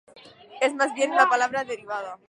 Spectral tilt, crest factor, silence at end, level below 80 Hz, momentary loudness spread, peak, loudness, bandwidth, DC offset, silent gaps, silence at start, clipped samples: -2 dB/octave; 22 dB; 0.15 s; -76 dBFS; 12 LU; -4 dBFS; -23 LUFS; 11 kHz; under 0.1%; none; 0.15 s; under 0.1%